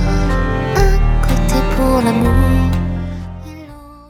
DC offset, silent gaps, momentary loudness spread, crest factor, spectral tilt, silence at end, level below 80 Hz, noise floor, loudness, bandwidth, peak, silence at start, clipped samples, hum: under 0.1%; none; 17 LU; 14 dB; -6.5 dB/octave; 0.1 s; -18 dBFS; -35 dBFS; -16 LUFS; 15.5 kHz; 0 dBFS; 0 s; under 0.1%; none